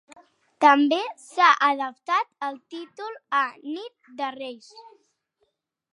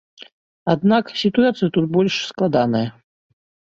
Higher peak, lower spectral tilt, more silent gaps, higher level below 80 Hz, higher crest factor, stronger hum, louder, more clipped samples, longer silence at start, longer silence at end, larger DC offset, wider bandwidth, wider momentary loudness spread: about the same, -4 dBFS vs -2 dBFS; second, -2 dB/octave vs -6.5 dB/octave; second, none vs 0.32-0.66 s; second, -88 dBFS vs -58 dBFS; about the same, 22 dB vs 18 dB; neither; second, -22 LUFS vs -19 LUFS; neither; first, 0.6 s vs 0.2 s; first, 1.1 s vs 0.85 s; neither; first, 11 kHz vs 7.6 kHz; first, 20 LU vs 6 LU